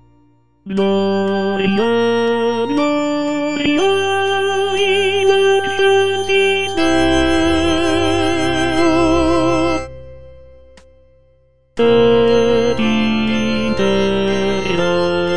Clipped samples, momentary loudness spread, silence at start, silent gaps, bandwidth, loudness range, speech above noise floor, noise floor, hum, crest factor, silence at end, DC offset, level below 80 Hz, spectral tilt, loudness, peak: under 0.1%; 5 LU; 0 s; none; 10 kHz; 3 LU; 40 dB; -55 dBFS; none; 14 dB; 0 s; 3%; -36 dBFS; -5 dB/octave; -15 LUFS; -2 dBFS